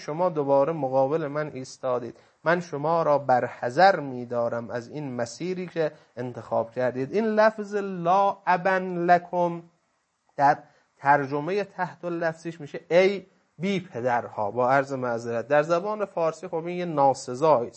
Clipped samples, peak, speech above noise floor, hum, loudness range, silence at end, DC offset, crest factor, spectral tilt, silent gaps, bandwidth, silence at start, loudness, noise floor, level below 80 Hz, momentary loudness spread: under 0.1%; -4 dBFS; 47 dB; none; 3 LU; 0.05 s; under 0.1%; 20 dB; -6 dB/octave; none; 8.6 kHz; 0 s; -25 LUFS; -72 dBFS; -74 dBFS; 11 LU